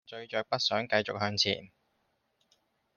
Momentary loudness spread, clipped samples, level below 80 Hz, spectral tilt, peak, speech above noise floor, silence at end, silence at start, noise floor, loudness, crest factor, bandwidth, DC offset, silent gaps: 8 LU; under 0.1%; -74 dBFS; -3.5 dB/octave; -12 dBFS; 45 dB; 1.3 s; 0.1 s; -76 dBFS; -30 LUFS; 22 dB; 12 kHz; under 0.1%; none